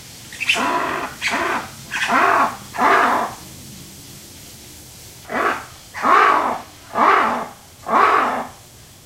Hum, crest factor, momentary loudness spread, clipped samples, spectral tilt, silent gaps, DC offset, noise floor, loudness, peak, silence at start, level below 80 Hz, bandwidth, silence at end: none; 18 dB; 23 LU; under 0.1%; -2.5 dB/octave; none; under 0.1%; -43 dBFS; -18 LUFS; -2 dBFS; 0 s; -54 dBFS; 16 kHz; 0.5 s